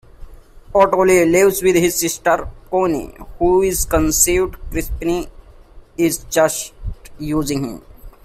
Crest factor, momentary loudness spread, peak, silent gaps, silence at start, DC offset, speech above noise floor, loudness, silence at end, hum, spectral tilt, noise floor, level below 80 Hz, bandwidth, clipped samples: 18 dB; 17 LU; 0 dBFS; none; 0.2 s; under 0.1%; 25 dB; -17 LUFS; 0.15 s; none; -4 dB/octave; -42 dBFS; -32 dBFS; 16 kHz; under 0.1%